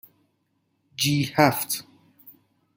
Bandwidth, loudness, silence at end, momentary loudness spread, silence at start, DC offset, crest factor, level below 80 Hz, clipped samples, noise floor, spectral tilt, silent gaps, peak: 17 kHz; -23 LUFS; 0.45 s; 10 LU; 1 s; under 0.1%; 26 dB; -64 dBFS; under 0.1%; -72 dBFS; -4 dB/octave; none; -2 dBFS